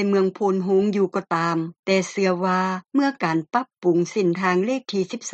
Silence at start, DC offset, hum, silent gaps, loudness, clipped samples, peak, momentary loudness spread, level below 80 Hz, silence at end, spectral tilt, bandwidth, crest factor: 0 s; under 0.1%; none; 1.79-1.83 s; -22 LUFS; under 0.1%; -6 dBFS; 4 LU; -68 dBFS; 0 s; -6 dB/octave; 8.6 kHz; 16 dB